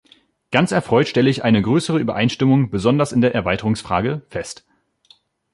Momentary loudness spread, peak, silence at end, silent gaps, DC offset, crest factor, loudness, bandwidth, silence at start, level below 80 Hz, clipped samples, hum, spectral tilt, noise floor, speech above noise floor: 10 LU; -2 dBFS; 1 s; none; under 0.1%; 18 dB; -18 LUFS; 11.5 kHz; 0.5 s; -46 dBFS; under 0.1%; none; -6.5 dB/octave; -55 dBFS; 38 dB